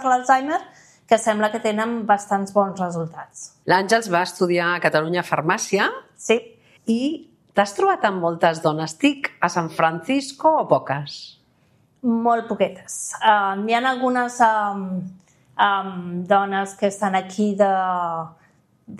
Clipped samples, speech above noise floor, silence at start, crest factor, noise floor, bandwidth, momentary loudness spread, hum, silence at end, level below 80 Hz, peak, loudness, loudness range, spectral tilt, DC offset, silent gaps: under 0.1%; 39 dB; 0 s; 18 dB; -60 dBFS; 14.5 kHz; 11 LU; none; 0 s; -70 dBFS; -2 dBFS; -21 LUFS; 2 LU; -4.5 dB/octave; under 0.1%; none